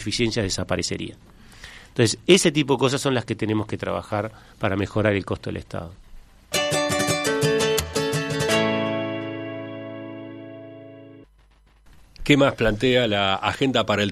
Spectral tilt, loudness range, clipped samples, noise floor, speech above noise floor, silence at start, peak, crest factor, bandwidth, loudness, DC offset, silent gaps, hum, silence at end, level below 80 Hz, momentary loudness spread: -4.5 dB/octave; 5 LU; under 0.1%; -56 dBFS; 34 dB; 0 s; 0 dBFS; 22 dB; 13.5 kHz; -22 LUFS; under 0.1%; none; none; 0 s; -46 dBFS; 18 LU